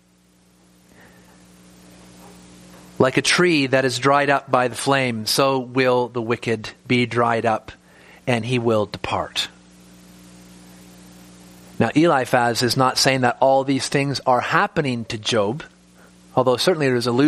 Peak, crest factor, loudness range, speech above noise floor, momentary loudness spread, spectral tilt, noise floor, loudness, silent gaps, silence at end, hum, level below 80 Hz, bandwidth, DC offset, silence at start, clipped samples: 0 dBFS; 20 dB; 7 LU; 37 dB; 8 LU; -4.5 dB/octave; -56 dBFS; -19 LUFS; none; 0 s; none; -56 dBFS; 15 kHz; under 0.1%; 2.25 s; under 0.1%